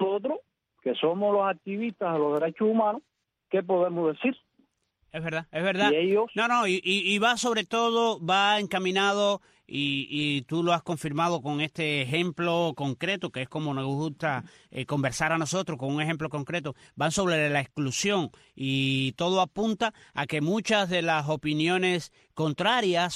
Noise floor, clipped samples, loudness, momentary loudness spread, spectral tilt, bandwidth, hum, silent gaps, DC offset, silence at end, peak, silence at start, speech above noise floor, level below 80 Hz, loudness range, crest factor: -70 dBFS; under 0.1%; -27 LUFS; 9 LU; -4.5 dB/octave; 14 kHz; none; none; under 0.1%; 0 s; -10 dBFS; 0 s; 44 dB; -64 dBFS; 5 LU; 16 dB